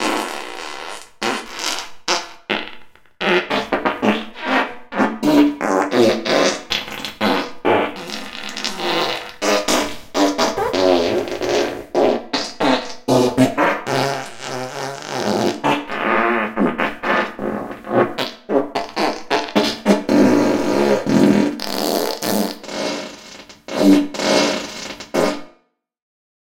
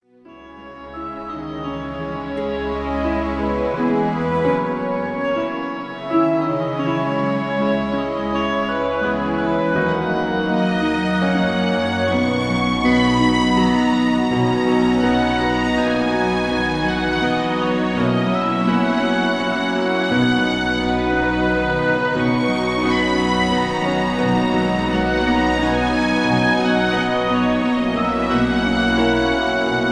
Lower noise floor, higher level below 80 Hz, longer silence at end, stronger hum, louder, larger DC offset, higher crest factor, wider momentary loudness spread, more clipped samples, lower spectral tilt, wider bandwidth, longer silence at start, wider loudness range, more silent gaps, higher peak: first, -60 dBFS vs -43 dBFS; second, -52 dBFS vs -38 dBFS; first, 1 s vs 0 s; neither; about the same, -19 LUFS vs -19 LUFS; second, under 0.1% vs 0.1%; about the same, 18 dB vs 14 dB; first, 12 LU vs 6 LU; neither; second, -4 dB/octave vs -6 dB/octave; first, 17 kHz vs 10.5 kHz; second, 0 s vs 0.3 s; about the same, 4 LU vs 4 LU; neither; first, 0 dBFS vs -6 dBFS